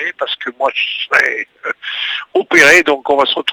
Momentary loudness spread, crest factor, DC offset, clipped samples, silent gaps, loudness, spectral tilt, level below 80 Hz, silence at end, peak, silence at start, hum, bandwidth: 14 LU; 14 dB; under 0.1%; 0.3%; none; -13 LUFS; -1.5 dB/octave; -54 dBFS; 0 s; 0 dBFS; 0 s; none; over 20 kHz